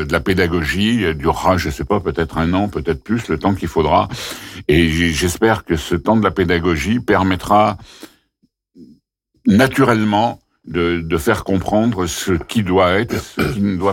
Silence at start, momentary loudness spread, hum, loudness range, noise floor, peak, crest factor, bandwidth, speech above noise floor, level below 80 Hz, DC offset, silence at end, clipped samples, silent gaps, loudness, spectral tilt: 0 s; 7 LU; none; 2 LU; -64 dBFS; -4 dBFS; 14 dB; 17 kHz; 48 dB; -36 dBFS; under 0.1%; 0 s; under 0.1%; none; -17 LUFS; -5.5 dB/octave